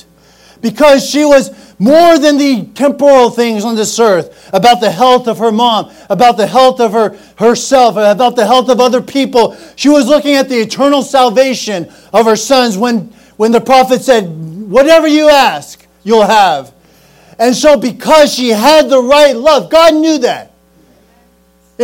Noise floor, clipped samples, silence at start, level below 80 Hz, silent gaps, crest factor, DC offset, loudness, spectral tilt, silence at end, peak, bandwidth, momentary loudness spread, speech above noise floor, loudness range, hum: -49 dBFS; 4%; 0.65 s; -46 dBFS; none; 8 dB; under 0.1%; -9 LUFS; -4 dB/octave; 0 s; 0 dBFS; 18.5 kHz; 9 LU; 41 dB; 2 LU; none